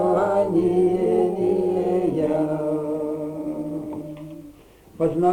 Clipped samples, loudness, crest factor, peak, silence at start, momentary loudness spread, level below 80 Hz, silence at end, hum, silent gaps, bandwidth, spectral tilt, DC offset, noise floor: under 0.1%; -22 LUFS; 14 dB; -8 dBFS; 0 s; 14 LU; -54 dBFS; 0 s; none; none; 10 kHz; -9 dB/octave; under 0.1%; -48 dBFS